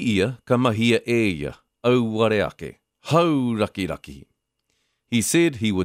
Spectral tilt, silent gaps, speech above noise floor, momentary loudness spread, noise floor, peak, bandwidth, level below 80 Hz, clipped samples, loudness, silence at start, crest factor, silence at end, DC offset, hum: -5 dB/octave; none; 52 dB; 13 LU; -73 dBFS; -6 dBFS; 15.5 kHz; -52 dBFS; under 0.1%; -21 LUFS; 0 s; 16 dB; 0 s; under 0.1%; none